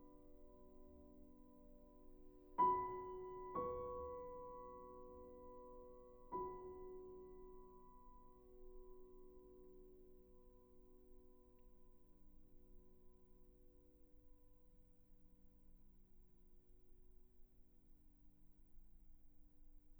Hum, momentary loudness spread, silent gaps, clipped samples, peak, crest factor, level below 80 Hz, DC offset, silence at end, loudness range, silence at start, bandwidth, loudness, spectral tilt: none; 21 LU; none; under 0.1%; -28 dBFS; 26 dB; -66 dBFS; under 0.1%; 0 s; 21 LU; 0 s; over 20 kHz; -48 LUFS; -8.5 dB/octave